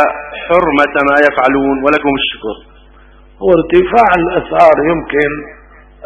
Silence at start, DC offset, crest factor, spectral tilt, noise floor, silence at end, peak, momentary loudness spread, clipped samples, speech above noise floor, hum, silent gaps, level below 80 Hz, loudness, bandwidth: 0 s; under 0.1%; 12 dB; -6.5 dB/octave; -41 dBFS; 0.55 s; 0 dBFS; 10 LU; 0.5%; 30 dB; none; none; -38 dBFS; -11 LUFS; 8.8 kHz